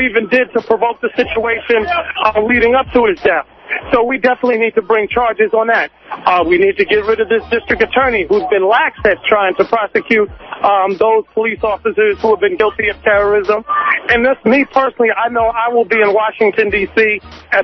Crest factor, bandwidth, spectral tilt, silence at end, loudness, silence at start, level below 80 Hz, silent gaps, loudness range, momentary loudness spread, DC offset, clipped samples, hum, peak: 14 dB; 6.2 kHz; -6.5 dB/octave; 0 s; -13 LUFS; 0 s; -40 dBFS; none; 1 LU; 4 LU; under 0.1%; under 0.1%; none; 0 dBFS